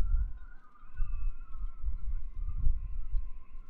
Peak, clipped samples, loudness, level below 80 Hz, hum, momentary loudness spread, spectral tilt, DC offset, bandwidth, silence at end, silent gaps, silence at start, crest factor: -14 dBFS; under 0.1%; -41 LUFS; -32 dBFS; none; 16 LU; -9 dB/octave; under 0.1%; 2.7 kHz; 0 s; none; 0 s; 16 dB